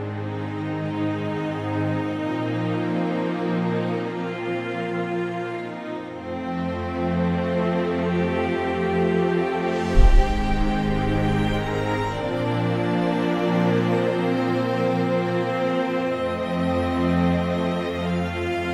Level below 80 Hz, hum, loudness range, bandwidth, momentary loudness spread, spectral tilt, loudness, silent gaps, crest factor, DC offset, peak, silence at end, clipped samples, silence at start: -30 dBFS; none; 4 LU; 11 kHz; 7 LU; -7.5 dB/octave; -24 LUFS; none; 20 dB; under 0.1%; -2 dBFS; 0 s; under 0.1%; 0 s